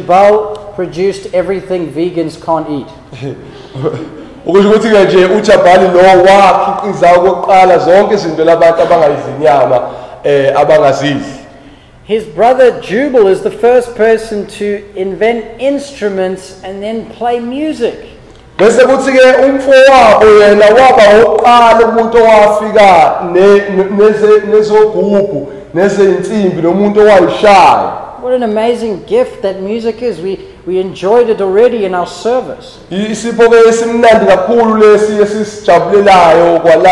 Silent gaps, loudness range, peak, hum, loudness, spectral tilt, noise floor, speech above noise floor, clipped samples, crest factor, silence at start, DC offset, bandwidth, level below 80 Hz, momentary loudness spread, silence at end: none; 10 LU; 0 dBFS; none; -8 LUFS; -5.5 dB/octave; -36 dBFS; 29 dB; 0.2%; 8 dB; 0 s; under 0.1%; 12 kHz; -40 dBFS; 14 LU; 0 s